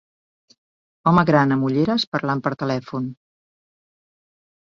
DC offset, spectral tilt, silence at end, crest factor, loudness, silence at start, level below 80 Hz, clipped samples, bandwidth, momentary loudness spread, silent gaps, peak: under 0.1%; -7.5 dB/octave; 1.65 s; 20 dB; -20 LUFS; 1.05 s; -56 dBFS; under 0.1%; 7.4 kHz; 12 LU; 2.07-2.12 s; -2 dBFS